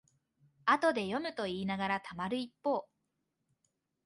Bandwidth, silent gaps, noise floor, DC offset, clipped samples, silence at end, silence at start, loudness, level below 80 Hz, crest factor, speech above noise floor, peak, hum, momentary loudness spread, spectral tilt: 11.5 kHz; none; -83 dBFS; under 0.1%; under 0.1%; 1.2 s; 0.65 s; -34 LUFS; -72 dBFS; 22 dB; 49 dB; -14 dBFS; none; 8 LU; -5.5 dB/octave